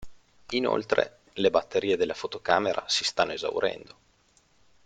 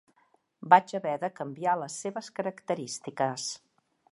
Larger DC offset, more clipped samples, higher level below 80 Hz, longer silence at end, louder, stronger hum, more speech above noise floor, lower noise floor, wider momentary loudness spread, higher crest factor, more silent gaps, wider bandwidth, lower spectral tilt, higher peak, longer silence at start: neither; neither; first, -62 dBFS vs -86 dBFS; first, 1.05 s vs 0.55 s; about the same, -27 LUFS vs -29 LUFS; neither; about the same, 37 dB vs 40 dB; second, -64 dBFS vs -69 dBFS; second, 7 LU vs 14 LU; about the same, 22 dB vs 26 dB; neither; second, 9.4 kHz vs 11.5 kHz; about the same, -3 dB/octave vs -4 dB/octave; about the same, -6 dBFS vs -4 dBFS; second, 0 s vs 0.6 s